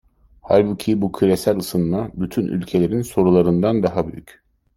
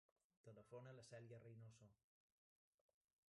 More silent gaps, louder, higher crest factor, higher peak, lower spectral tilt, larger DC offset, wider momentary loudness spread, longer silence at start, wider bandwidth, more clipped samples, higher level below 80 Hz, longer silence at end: neither; first, -19 LUFS vs -63 LUFS; about the same, 18 dB vs 18 dB; first, -2 dBFS vs -48 dBFS; first, -7.5 dB/octave vs -6 dB/octave; neither; about the same, 8 LU vs 6 LU; about the same, 0.45 s vs 0.45 s; first, 16.5 kHz vs 11 kHz; neither; first, -48 dBFS vs under -90 dBFS; second, 0.55 s vs 1.35 s